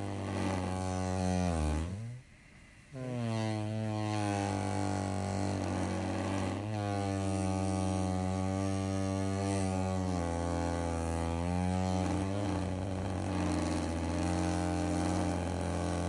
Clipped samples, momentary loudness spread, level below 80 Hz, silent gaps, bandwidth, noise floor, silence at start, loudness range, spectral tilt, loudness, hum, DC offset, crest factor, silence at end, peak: under 0.1%; 3 LU; -52 dBFS; none; 11.5 kHz; -56 dBFS; 0 s; 2 LU; -6 dB/octave; -34 LUFS; none; under 0.1%; 14 dB; 0 s; -20 dBFS